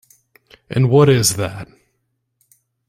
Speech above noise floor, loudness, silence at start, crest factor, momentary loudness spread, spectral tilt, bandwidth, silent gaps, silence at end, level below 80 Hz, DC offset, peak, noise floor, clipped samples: 56 dB; -15 LUFS; 0.7 s; 18 dB; 14 LU; -5 dB/octave; 16 kHz; none; 1.25 s; -50 dBFS; under 0.1%; -2 dBFS; -71 dBFS; under 0.1%